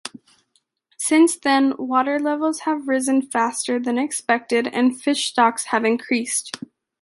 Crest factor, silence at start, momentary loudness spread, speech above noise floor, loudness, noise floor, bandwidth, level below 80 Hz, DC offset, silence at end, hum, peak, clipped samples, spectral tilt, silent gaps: 18 dB; 0.05 s; 8 LU; 47 dB; -20 LUFS; -67 dBFS; 11.5 kHz; -72 dBFS; under 0.1%; 0.45 s; none; -2 dBFS; under 0.1%; -2 dB/octave; none